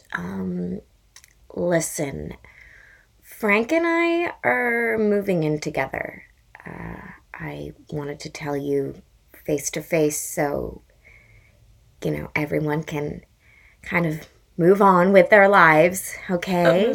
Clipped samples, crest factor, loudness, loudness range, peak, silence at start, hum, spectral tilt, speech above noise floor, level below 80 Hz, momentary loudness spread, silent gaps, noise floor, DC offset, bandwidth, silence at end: under 0.1%; 22 dB; -21 LUFS; 12 LU; 0 dBFS; 0.1 s; none; -5.5 dB/octave; 34 dB; -52 dBFS; 21 LU; none; -55 dBFS; under 0.1%; 19 kHz; 0 s